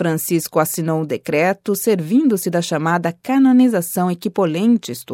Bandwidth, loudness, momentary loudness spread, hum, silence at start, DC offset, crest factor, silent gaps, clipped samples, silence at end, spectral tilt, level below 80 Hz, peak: 17 kHz; -17 LUFS; 7 LU; none; 0 s; under 0.1%; 14 dB; none; under 0.1%; 0 s; -5.5 dB/octave; -68 dBFS; -2 dBFS